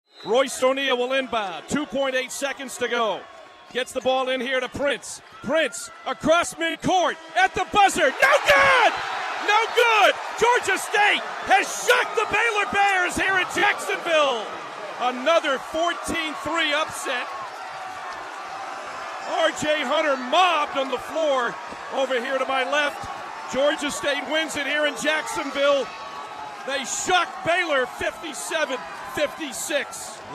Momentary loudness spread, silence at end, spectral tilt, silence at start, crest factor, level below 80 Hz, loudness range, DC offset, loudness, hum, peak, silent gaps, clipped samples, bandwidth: 14 LU; 0 s; -2 dB/octave; 0.15 s; 18 dB; -56 dBFS; 7 LU; under 0.1%; -22 LUFS; none; -6 dBFS; none; under 0.1%; 15 kHz